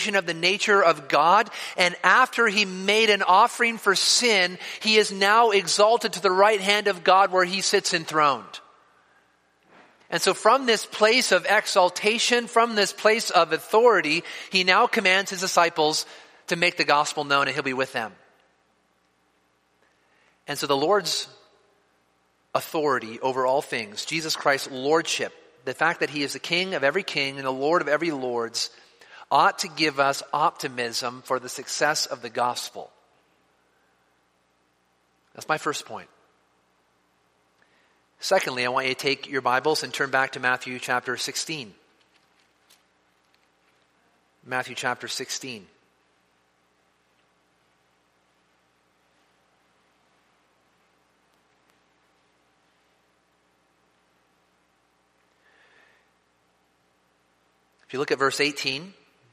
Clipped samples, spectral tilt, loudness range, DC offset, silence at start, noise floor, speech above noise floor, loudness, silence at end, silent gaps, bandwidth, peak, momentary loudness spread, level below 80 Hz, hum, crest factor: under 0.1%; -2 dB/octave; 15 LU; under 0.1%; 0 s; -67 dBFS; 44 dB; -22 LUFS; 0.4 s; none; 15.5 kHz; -2 dBFS; 12 LU; -76 dBFS; 60 Hz at -70 dBFS; 24 dB